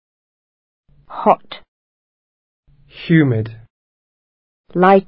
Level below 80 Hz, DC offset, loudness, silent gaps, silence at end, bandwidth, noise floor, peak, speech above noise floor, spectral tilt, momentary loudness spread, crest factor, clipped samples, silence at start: -56 dBFS; under 0.1%; -16 LUFS; 1.68-2.63 s, 3.70-4.64 s; 0.05 s; 5.4 kHz; under -90 dBFS; 0 dBFS; over 76 dB; -10.5 dB/octave; 20 LU; 20 dB; under 0.1%; 1.1 s